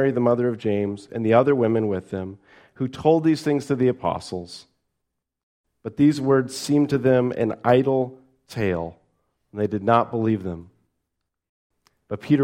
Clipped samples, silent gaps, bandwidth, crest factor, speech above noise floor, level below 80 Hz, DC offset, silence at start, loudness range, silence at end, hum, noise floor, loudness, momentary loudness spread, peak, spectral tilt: under 0.1%; 5.43-5.64 s, 11.49-11.70 s; 15.5 kHz; 20 dB; 59 dB; -58 dBFS; under 0.1%; 0 s; 5 LU; 0 s; none; -80 dBFS; -22 LUFS; 16 LU; -4 dBFS; -7 dB/octave